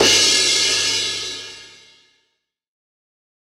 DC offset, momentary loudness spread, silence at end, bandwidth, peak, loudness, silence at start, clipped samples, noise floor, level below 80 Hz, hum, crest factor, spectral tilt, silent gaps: under 0.1%; 18 LU; 1.9 s; 17.5 kHz; -4 dBFS; -15 LUFS; 0 s; under 0.1%; -72 dBFS; -56 dBFS; 50 Hz at -65 dBFS; 16 dB; 0.5 dB/octave; none